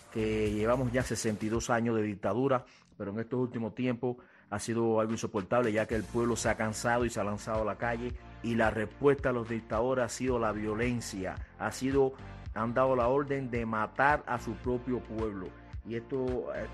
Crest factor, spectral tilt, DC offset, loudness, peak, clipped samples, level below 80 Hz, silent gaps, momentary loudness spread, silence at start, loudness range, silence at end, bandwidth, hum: 20 dB; -5.5 dB/octave; under 0.1%; -32 LUFS; -10 dBFS; under 0.1%; -50 dBFS; none; 10 LU; 0 s; 2 LU; 0 s; 12.5 kHz; none